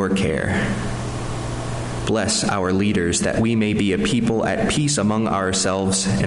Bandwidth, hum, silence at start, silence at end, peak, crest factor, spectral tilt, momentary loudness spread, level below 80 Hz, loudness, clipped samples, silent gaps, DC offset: 11.5 kHz; none; 0 s; 0 s; -8 dBFS; 12 dB; -4.5 dB/octave; 8 LU; -38 dBFS; -20 LUFS; under 0.1%; none; under 0.1%